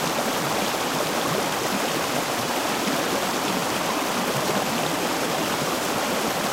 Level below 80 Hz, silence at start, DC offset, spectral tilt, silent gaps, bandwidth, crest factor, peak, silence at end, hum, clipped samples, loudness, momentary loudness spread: -56 dBFS; 0 s; under 0.1%; -3 dB/octave; none; 16 kHz; 14 dB; -10 dBFS; 0 s; none; under 0.1%; -24 LUFS; 1 LU